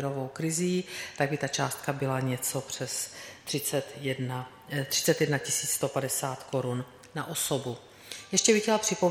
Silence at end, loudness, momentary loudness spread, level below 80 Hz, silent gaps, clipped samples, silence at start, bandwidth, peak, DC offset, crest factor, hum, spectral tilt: 0 s; -29 LUFS; 12 LU; -68 dBFS; none; under 0.1%; 0 s; 16.5 kHz; -8 dBFS; under 0.1%; 22 dB; none; -3.5 dB/octave